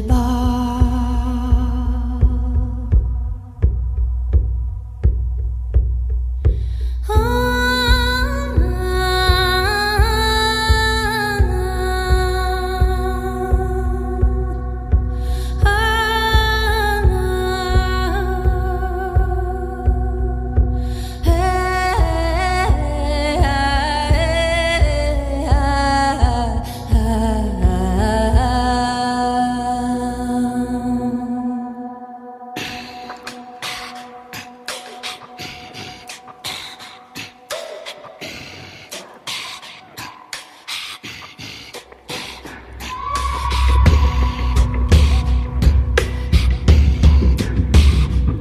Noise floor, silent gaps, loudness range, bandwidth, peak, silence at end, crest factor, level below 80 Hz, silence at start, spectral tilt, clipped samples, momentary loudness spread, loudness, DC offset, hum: -37 dBFS; none; 14 LU; 15 kHz; -2 dBFS; 0 s; 16 dB; -20 dBFS; 0 s; -5.5 dB/octave; under 0.1%; 16 LU; -18 LUFS; under 0.1%; none